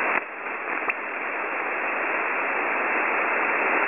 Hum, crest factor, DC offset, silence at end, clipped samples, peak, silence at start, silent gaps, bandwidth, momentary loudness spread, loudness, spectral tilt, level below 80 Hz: none; 18 dB; 0.1%; 0 s; under 0.1%; -8 dBFS; 0 s; none; 3.7 kHz; 6 LU; -24 LUFS; -0.5 dB/octave; -74 dBFS